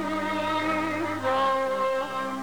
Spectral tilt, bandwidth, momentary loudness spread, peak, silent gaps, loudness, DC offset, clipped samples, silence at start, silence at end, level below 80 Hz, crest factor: -5 dB/octave; over 20 kHz; 4 LU; -16 dBFS; none; -26 LUFS; 0.4%; under 0.1%; 0 s; 0 s; -60 dBFS; 12 dB